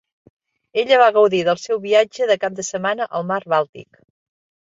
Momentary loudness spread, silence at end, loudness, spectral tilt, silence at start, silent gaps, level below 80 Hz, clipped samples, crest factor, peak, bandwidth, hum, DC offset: 10 LU; 0.95 s; -18 LUFS; -3.5 dB/octave; 0.75 s; 3.69-3.73 s; -68 dBFS; under 0.1%; 18 dB; -2 dBFS; 7.8 kHz; none; under 0.1%